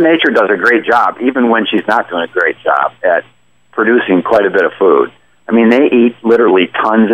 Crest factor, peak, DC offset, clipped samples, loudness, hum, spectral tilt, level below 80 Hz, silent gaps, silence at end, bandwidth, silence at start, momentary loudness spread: 10 dB; 0 dBFS; 0.2%; under 0.1%; -11 LUFS; none; -6.5 dB/octave; -58 dBFS; none; 0 s; 8.4 kHz; 0 s; 5 LU